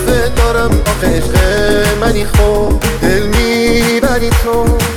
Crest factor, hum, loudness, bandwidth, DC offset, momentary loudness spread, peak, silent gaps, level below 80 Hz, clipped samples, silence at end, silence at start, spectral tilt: 12 dB; none; -12 LUFS; 18.5 kHz; 7%; 2 LU; 0 dBFS; none; -16 dBFS; under 0.1%; 0 s; 0 s; -5 dB/octave